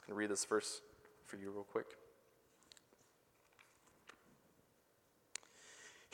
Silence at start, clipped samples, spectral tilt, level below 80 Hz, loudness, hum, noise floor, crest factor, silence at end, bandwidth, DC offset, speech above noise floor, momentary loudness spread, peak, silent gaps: 0 s; under 0.1%; -2.5 dB/octave; -88 dBFS; -44 LUFS; none; -75 dBFS; 24 dB; 0.1 s; 18.5 kHz; under 0.1%; 32 dB; 25 LU; -24 dBFS; none